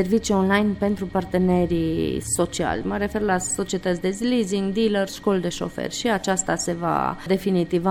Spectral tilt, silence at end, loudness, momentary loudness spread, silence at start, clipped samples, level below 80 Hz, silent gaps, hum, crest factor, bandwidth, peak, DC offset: -5 dB/octave; 0 s; -23 LUFS; 5 LU; 0 s; under 0.1%; -44 dBFS; none; none; 18 dB; 17 kHz; -6 dBFS; under 0.1%